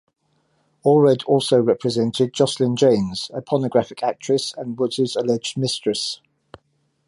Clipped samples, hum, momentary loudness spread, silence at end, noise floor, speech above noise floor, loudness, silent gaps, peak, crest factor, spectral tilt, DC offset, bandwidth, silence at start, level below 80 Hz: under 0.1%; none; 9 LU; 0.9 s; -67 dBFS; 47 dB; -20 LUFS; none; -4 dBFS; 16 dB; -5.5 dB/octave; under 0.1%; 11.5 kHz; 0.85 s; -60 dBFS